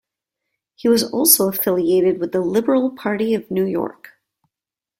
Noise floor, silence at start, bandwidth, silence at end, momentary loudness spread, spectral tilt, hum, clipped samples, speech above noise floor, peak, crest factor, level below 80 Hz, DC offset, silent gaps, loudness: -89 dBFS; 0.85 s; 16.5 kHz; 1.1 s; 9 LU; -4 dB/octave; none; under 0.1%; 71 dB; 0 dBFS; 20 dB; -62 dBFS; under 0.1%; none; -18 LUFS